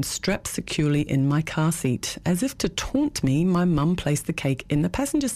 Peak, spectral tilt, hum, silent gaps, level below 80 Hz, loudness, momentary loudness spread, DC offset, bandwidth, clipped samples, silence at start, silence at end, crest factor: -12 dBFS; -5.5 dB/octave; none; none; -44 dBFS; -24 LUFS; 5 LU; under 0.1%; 15.5 kHz; under 0.1%; 0 s; 0 s; 12 dB